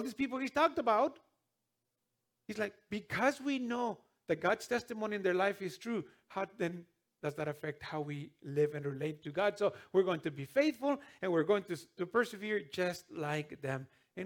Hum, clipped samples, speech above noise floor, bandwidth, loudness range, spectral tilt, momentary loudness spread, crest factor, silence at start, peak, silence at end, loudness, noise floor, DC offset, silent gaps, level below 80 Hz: none; under 0.1%; 51 dB; 19.5 kHz; 5 LU; -5.5 dB/octave; 11 LU; 20 dB; 0 s; -16 dBFS; 0 s; -36 LUFS; -86 dBFS; under 0.1%; none; -76 dBFS